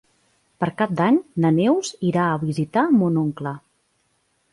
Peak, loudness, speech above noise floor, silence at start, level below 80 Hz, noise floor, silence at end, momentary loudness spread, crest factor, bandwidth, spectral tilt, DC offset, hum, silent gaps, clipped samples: -6 dBFS; -21 LUFS; 47 dB; 0.6 s; -60 dBFS; -67 dBFS; 0.95 s; 9 LU; 14 dB; 11.5 kHz; -7 dB/octave; under 0.1%; none; none; under 0.1%